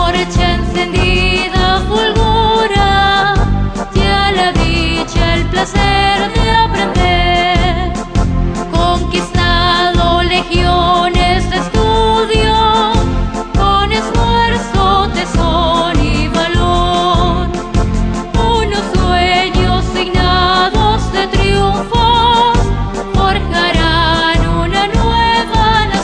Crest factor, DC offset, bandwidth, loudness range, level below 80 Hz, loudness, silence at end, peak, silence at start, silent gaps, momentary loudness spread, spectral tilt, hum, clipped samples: 12 dB; under 0.1%; 10 kHz; 2 LU; -18 dBFS; -12 LUFS; 0 s; 0 dBFS; 0 s; none; 5 LU; -5 dB/octave; none; under 0.1%